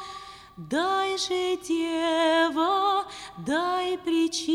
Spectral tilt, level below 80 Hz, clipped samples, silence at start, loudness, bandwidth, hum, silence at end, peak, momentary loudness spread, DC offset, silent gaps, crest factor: -3 dB/octave; -62 dBFS; under 0.1%; 0 s; -25 LUFS; 14.5 kHz; none; 0 s; -12 dBFS; 15 LU; under 0.1%; none; 14 dB